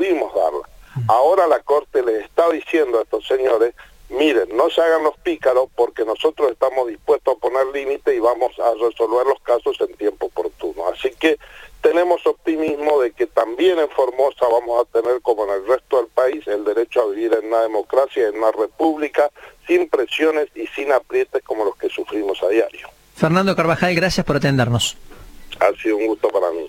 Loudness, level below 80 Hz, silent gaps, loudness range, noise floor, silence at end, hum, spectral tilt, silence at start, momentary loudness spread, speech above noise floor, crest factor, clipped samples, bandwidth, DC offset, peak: -19 LUFS; -50 dBFS; none; 2 LU; -37 dBFS; 0 s; none; -5.5 dB/octave; 0 s; 6 LU; 19 dB; 18 dB; under 0.1%; 17 kHz; under 0.1%; -2 dBFS